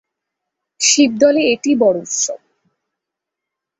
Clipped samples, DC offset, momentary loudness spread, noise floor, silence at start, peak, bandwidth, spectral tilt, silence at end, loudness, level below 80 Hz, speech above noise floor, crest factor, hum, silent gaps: under 0.1%; under 0.1%; 8 LU; -82 dBFS; 0.8 s; -2 dBFS; 8.4 kHz; -2 dB/octave; 1.45 s; -14 LUFS; -64 dBFS; 68 dB; 16 dB; none; none